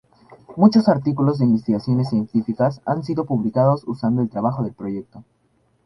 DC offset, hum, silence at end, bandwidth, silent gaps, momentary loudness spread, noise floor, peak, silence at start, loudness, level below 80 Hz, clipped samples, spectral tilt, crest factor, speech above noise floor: under 0.1%; none; 0.65 s; 6 kHz; none; 11 LU; -46 dBFS; -2 dBFS; 0.5 s; -20 LUFS; -56 dBFS; under 0.1%; -9.5 dB/octave; 18 dB; 27 dB